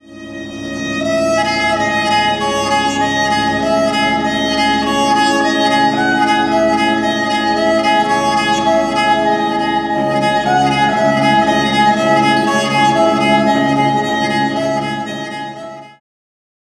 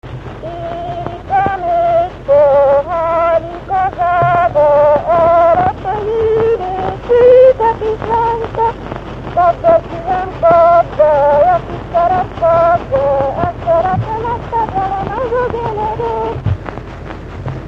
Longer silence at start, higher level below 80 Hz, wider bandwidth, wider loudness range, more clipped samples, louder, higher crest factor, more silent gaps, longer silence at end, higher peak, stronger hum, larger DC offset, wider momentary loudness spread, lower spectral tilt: about the same, 0.1 s vs 0.05 s; second, -44 dBFS vs -34 dBFS; first, 14 kHz vs 7 kHz; about the same, 3 LU vs 5 LU; neither; about the same, -14 LUFS vs -13 LUFS; about the same, 14 dB vs 12 dB; neither; first, 0.85 s vs 0 s; about the same, 0 dBFS vs 0 dBFS; neither; neither; second, 7 LU vs 13 LU; second, -4 dB/octave vs -8 dB/octave